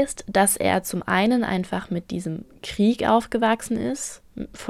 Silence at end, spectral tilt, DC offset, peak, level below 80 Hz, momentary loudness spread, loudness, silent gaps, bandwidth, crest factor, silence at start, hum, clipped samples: 0 s; -4.5 dB/octave; under 0.1%; -4 dBFS; -50 dBFS; 14 LU; -23 LUFS; none; 16 kHz; 18 dB; 0 s; none; under 0.1%